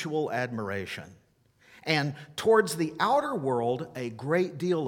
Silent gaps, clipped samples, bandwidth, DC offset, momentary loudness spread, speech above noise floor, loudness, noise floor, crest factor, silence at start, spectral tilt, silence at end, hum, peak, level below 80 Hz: none; under 0.1%; 17.5 kHz; under 0.1%; 12 LU; 35 dB; -28 LUFS; -63 dBFS; 20 dB; 0 s; -5.5 dB/octave; 0 s; none; -8 dBFS; -70 dBFS